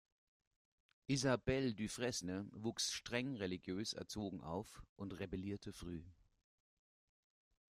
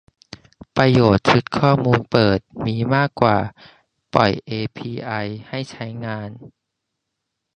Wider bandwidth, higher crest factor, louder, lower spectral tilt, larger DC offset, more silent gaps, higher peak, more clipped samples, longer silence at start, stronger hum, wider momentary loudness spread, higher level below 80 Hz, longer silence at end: first, 15 kHz vs 9.2 kHz; about the same, 22 dB vs 20 dB; second, -43 LUFS vs -19 LUFS; second, -4.5 dB/octave vs -7 dB/octave; neither; first, 4.89-4.96 s vs none; second, -24 dBFS vs 0 dBFS; neither; first, 1.1 s vs 0.75 s; neither; about the same, 13 LU vs 15 LU; second, -64 dBFS vs -46 dBFS; first, 1.65 s vs 1.1 s